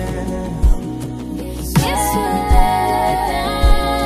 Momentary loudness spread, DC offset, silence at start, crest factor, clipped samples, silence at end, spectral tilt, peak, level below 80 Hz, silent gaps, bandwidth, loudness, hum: 10 LU; under 0.1%; 0 s; 16 dB; under 0.1%; 0 s; -5 dB/octave; 0 dBFS; -18 dBFS; none; 15.5 kHz; -18 LUFS; none